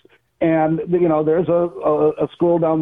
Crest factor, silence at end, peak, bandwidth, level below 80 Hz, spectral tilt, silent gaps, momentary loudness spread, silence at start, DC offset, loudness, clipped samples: 10 dB; 0 s; -8 dBFS; 3.8 kHz; -54 dBFS; -11 dB/octave; none; 3 LU; 0.4 s; under 0.1%; -18 LUFS; under 0.1%